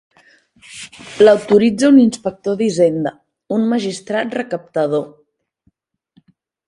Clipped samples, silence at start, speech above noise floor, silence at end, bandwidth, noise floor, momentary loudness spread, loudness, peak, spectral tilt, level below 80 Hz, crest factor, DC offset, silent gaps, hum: under 0.1%; 0.7 s; 48 dB; 1.6 s; 11.5 kHz; -62 dBFS; 22 LU; -15 LUFS; 0 dBFS; -5.5 dB/octave; -60 dBFS; 16 dB; under 0.1%; none; none